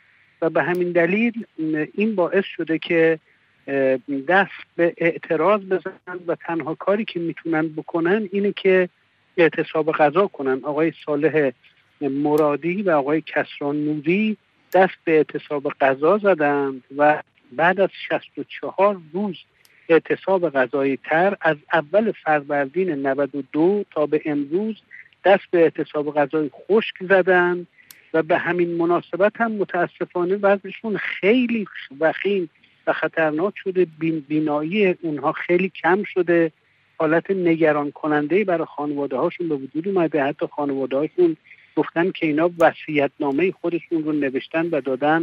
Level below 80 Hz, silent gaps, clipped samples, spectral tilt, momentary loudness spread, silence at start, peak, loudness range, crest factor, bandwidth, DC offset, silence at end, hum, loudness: -74 dBFS; none; under 0.1%; -8 dB/octave; 8 LU; 0.4 s; -2 dBFS; 2 LU; 18 dB; 12.5 kHz; under 0.1%; 0 s; none; -21 LUFS